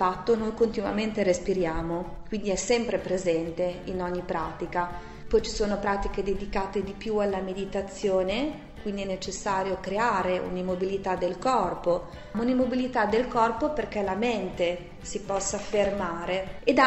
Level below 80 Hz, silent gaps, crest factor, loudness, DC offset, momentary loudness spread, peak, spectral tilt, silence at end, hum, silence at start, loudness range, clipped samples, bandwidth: -44 dBFS; none; 22 dB; -28 LUFS; under 0.1%; 7 LU; -6 dBFS; -4.5 dB/octave; 0 s; none; 0 s; 3 LU; under 0.1%; 8.4 kHz